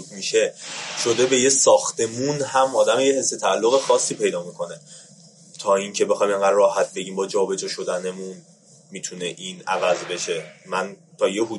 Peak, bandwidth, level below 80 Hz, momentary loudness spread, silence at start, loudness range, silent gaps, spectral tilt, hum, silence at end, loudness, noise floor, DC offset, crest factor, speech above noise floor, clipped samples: -4 dBFS; 11.5 kHz; -72 dBFS; 14 LU; 0 s; 8 LU; none; -2.5 dB/octave; none; 0 s; -21 LUFS; -49 dBFS; under 0.1%; 18 dB; 27 dB; under 0.1%